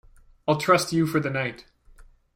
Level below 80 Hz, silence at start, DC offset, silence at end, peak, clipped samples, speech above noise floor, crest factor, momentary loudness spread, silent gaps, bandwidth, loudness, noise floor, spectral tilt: -56 dBFS; 0.45 s; under 0.1%; 0.75 s; -6 dBFS; under 0.1%; 28 dB; 20 dB; 11 LU; none; 16 kHz; -24 LUFS; -51 dBFS; -5 dB/octave